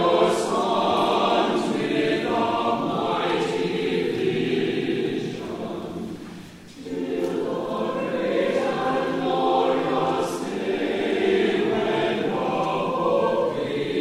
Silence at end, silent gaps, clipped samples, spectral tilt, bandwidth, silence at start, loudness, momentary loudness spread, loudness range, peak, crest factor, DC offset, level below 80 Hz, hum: 0 s; none; under 0.1%; -5.5 dB/octave; 15 kHz; 0 s; -24 LUFS; 10 LU; 5 LU; -6 dBFS; 18 dB; under 0.1%; -58 dBFS; none